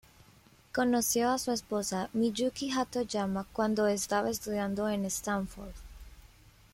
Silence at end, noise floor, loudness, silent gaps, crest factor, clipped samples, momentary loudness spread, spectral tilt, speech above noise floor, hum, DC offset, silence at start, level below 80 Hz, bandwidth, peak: 0.5 s; -60 dBFS; -31 LUFS; none; 16 dB; under 0.1%; 7 LU; -4 dB/octave; 29 dB; none; under 0.1%; 0.75 s; -56 dBFS; 16.5 kHz; -16 dBFS